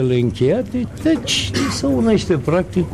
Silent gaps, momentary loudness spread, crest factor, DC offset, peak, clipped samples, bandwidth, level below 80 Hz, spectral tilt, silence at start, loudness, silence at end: none; 4 LU; 12 dB; 0.3%; -6 dBFS; under 0.1%; 14 kHz; -38 dBFS; -5.5 dB/octave; 0 s; -18 LUFS; 0 s